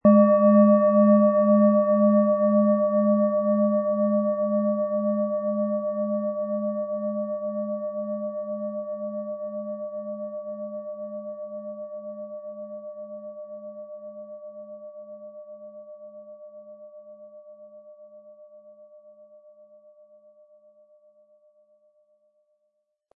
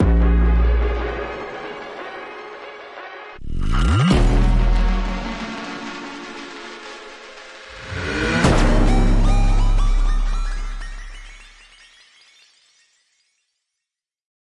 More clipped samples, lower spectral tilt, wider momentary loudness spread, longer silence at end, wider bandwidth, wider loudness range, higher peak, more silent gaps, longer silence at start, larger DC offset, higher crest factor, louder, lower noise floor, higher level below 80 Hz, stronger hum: neither; first, -15 dB/octave vs -6 dB/octave; first, 25 LU vs 19 LU; first, 4.3 s vs 3.05 s; second, 2.7 kHz vs 11 kHz; first, 24 LU vs 10 LU; about the same, -6 dBFS vs -4 dBFS; neither; about the same, 0.05 s vs 0 s; neither; about the same, 20 dB vs 16 dB; about the same, -23 LUFS vs -21 LUFS; second, -75 dBFS vs -85 dBFS; second, -74 dBFS vs -20 dBFS; neither